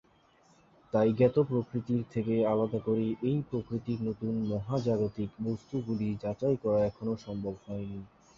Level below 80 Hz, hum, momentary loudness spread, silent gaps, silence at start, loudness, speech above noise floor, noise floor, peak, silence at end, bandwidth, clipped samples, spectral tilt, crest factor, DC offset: -60 dBFS; none; 10 LU; none; 0.95 s; -31 LUFS; 33 dB; -64 dBFS; -12 dBFS; 0.3 s; 7.2 kHz; under 0.1%; -9.5 dB/octave; 20 dB; under 0.1%